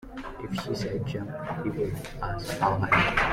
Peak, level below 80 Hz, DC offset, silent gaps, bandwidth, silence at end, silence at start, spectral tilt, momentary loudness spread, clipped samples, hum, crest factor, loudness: -8 dBFS; -44 dBFS; under 0.1%; none; 16.5 kHz; 0 s; 0 s; -5.5 dB/octave; 12 LU; under 0.1%; none; 20 dB; -28 LUFS